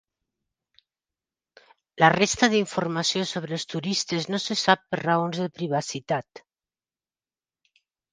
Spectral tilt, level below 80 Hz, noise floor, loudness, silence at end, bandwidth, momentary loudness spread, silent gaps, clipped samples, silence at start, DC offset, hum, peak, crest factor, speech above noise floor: -4 dB/octave; -64 dBFS; under -90 dBFS; -24 LUFS; 1.75 s; 10 kHz; 9 LU; none; under 0.1%; 1.95 s; under 0.1%; none; -2 dBFS; 26 dB; over 66 dB